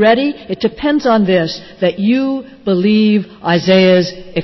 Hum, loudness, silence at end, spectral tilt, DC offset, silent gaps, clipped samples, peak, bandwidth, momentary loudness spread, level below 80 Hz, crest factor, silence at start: none; -14 LUFS; 0 s; -7 dB/octave; under 0.1%; none; under 0.1%; -2 dBFS; 6.2 kHz; 9 LU; -48 dBFS; 12 dB; 0 s